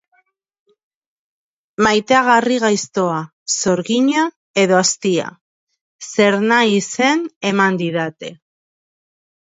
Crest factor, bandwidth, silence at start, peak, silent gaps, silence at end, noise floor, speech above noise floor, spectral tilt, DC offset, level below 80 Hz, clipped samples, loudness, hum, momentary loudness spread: 18 dB; 8 kHz; 1.8 s; 0 dBFS; 3.33-3.46 s, 4.36-4.54 s, 5.41-5.67 s, 5.81-5.99 s, 7.36-7.41 s; 1.1 s; -62 dBFS; 47 dB; -3.5 dB/octave; under 0.1%; -60 dBFS; under 0.1%; -16 LUFS; none; 11 LU